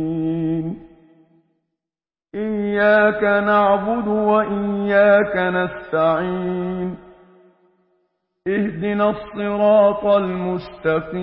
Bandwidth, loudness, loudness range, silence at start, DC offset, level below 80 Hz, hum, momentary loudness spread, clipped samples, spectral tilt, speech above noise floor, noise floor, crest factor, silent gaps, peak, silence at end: 5.4 kHz; -18 LUFS; 8 LU; 0 s; under 0.1%; -52 dBFS; none; 11 LU; under 0.1%; -11.5 dB/octave; over 72 dB; under -90 dBFS; 16 dB; none; -4 dBFS; 0 s